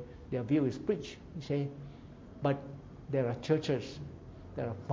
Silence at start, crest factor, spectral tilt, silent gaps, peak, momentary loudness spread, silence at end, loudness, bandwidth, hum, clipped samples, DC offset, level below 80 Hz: 0 s; 20 dB; -7.5 dB/octave; none; -16 dBFS; 18 LU; 0 s; -35 LUFS; 7.6 kHz; none; under 0.1%; under 0.1%; -56 dBFS